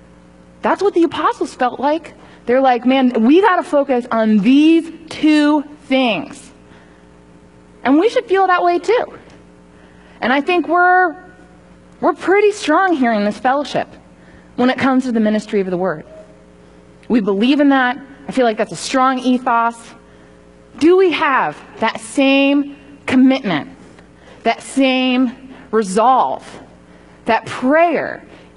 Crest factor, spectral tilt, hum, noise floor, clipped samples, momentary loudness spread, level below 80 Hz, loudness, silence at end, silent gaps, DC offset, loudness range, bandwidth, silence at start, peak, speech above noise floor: 14 dB; -5 dB/octave; none; -44 dBFS; under 0.1%; 11 LU; -54 dBFS; -15 LUFS; 0.2 s; none; 0.1%; 4 LU; 11 kHz; 0.65 s; -2 dBFS; 30 dB